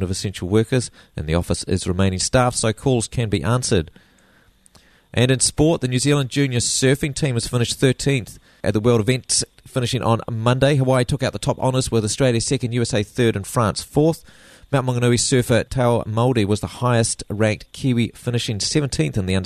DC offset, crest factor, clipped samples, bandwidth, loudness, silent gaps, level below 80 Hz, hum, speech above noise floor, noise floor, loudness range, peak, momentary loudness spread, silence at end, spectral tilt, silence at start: under 0.1%; 16 dB; under 0.1%; 13.5 kHz; -20 LUFS; none; -42 dBFS; none; 35 dB; -55 dBFS; 2 LU; -4 dBFS; 6 LU; 0 s; -5 dB/octave; 0 s